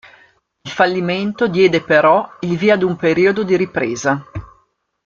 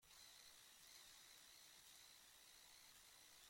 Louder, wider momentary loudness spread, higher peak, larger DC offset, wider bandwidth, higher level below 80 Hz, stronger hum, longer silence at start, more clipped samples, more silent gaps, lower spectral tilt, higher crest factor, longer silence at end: first, -15 LUFS vs -64 LUFS; first, 11 LU vs 2 LU; first, 0 dBFS vs -46 dBFS; neither; second, 7.4 kHz vs 16.5 kHz; first, -50 dBFS vs -88 dBFS; neither; first, 0.65 s vs 0 s; neither; neither; first, -5.5 dB/octave vs 0.5 dB/octave; about the same, 16 dB vs 20 dB; first, 0.6 s vs 0 s